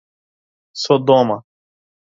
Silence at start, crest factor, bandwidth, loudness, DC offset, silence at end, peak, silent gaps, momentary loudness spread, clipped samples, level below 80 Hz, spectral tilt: 0.75 s; 20 dB; 7.8 kHz; -16 LUFS; under 0.1%; 0.75 s; 0 dBFS; none; 15 LU; under 0.1%; -66 dBFS; -6 dB/octave